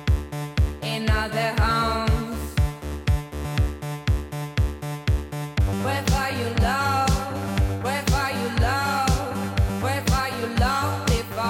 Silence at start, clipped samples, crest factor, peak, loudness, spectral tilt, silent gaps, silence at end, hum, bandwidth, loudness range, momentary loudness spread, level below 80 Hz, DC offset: 0 s; under 0.1%; 12 dB; -10 dBFS; -24 LUFS; -5.5 dB/octave; none; 0 s; none; 17 kHz; 3 LU; 6 LU; -28 dBFS; under 0.1%